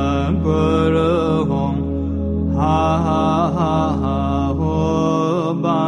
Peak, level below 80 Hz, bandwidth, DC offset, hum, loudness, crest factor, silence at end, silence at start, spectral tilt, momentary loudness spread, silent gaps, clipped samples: -4 dBFS; -30 dBFS; 8.8 kHz; under 0.1%; none; -18 LUFS; 12 dB; 0 s; 0 s; -8 dB/octave; 5 LU; none; under 0.1%